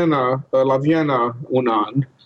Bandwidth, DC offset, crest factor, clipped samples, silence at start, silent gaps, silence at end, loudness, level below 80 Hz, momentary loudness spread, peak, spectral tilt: 6.6 kHz; under 0.1%; 10 dB; under 0.1%; 0 s; none; 0.2 s; -19 LUFS; -62 dBFS; 4 LU; -8 dBFS; -8.5 dB/octave